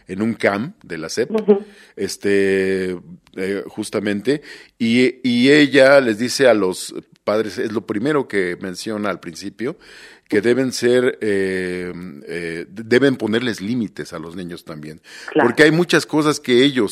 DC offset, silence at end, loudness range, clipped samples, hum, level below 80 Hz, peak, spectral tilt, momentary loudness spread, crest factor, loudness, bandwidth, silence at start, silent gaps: under 0.1%; 0 s; 7 LU; under 0.1%; none; -60 dBFS; 0 dBFS; -5 dB/octave; 17 LU; 18 dB; -18 LUFS; 15 kHz; 0.1 s; none